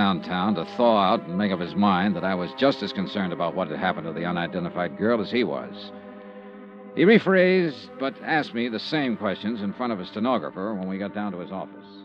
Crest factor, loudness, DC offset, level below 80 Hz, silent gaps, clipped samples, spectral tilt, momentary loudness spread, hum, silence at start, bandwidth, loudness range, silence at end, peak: 20 dB; -24 LUFS; under 0.1%; -66 dBFS; none; under 0.1%; -8 dB/octave; 16 LU; none; 0 s; 6.8 kHz; 5 LU; 0 s; -6 dBFS